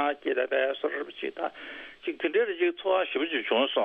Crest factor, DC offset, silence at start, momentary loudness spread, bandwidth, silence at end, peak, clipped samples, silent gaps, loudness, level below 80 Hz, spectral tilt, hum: 16 dB; under 0.1%; 0 s; 10 LU; 4.8 kHz; 0 s; -12 dBFS; under 0.1%; none; -28 LUFS; -74 dBFS; -5.5 dB/octave; none